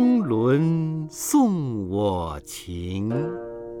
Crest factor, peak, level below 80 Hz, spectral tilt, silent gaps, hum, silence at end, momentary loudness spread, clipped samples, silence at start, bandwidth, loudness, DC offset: 14 dB; -8 dBFS; -48 dBFS; -6.5 dB/octave; none; none; 0 s; 14 LU; under 0.1%; 0 s; 19 kHz; -24 LUFS; under 0.1%